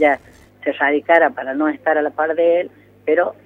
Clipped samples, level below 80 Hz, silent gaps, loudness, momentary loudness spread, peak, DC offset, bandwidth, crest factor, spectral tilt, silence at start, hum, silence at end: under 0.1%; -60 dBFS; none; -18 LUFS; 11 LU; 0 dBFS; under 0.1%; 4.7 kHz; 16 dB; -6 dB/octave; 0 s; 50 Hz at -55 dBFS; 0.15 s